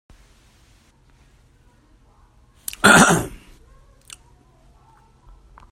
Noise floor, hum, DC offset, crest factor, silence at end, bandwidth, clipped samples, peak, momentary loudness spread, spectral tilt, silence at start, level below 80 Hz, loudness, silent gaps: -55 dBFS; none; under 0.1%; 24 dB; 2.45 s; 16 kHz; under 0.1%; 0 dBFS; 23 LU; -3 dB/octave; 2.85 s; -46 dBFS; -14 LUFS; none